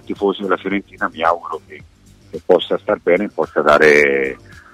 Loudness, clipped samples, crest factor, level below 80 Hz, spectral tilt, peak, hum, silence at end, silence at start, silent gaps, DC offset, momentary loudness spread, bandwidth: -16 LUFS; under 0.1%; 16 dB; -50 dBFS; -5 dB/octave; -2 dBFS; none; 0.35 s; 0.1 s; none; under 0.1%; 19 LU; 12.5 kHz